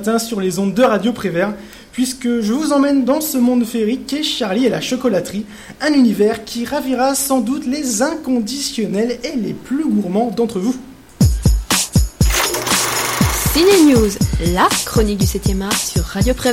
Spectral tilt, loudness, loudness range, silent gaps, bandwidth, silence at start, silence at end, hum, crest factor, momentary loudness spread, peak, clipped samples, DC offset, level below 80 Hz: -4.5 dB/octave; -16 LUFS; 5 LU; none; 16.5 kHz; 0 s; 0 s; none; 14 dB; 7 LU; -2 dBFS; under 0.1%; under 0.1%; -26 dBFS